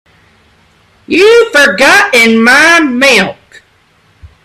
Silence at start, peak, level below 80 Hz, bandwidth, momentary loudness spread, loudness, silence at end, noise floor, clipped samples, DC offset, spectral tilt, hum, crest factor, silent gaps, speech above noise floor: 1.1 s; 0 dBFS; -46 dBFS; 16.5 kHz; 5 LU; -5 LUFS; 0.2 s; -49 dBFS; 0.5%; under 0.1%; -2.5 dB/octave; none; 8 dB; none; 43 dB